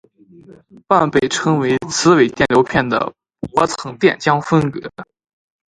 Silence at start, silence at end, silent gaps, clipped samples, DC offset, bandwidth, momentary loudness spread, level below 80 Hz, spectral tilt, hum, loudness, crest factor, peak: 0.9 s; 0.65 s; none; under 0.1%; under 0.1%; 11 kHz; 10 LU; -48 dBFS; -5 dB/octave; none; -16 LUFS; 16 dB; 0 dBFS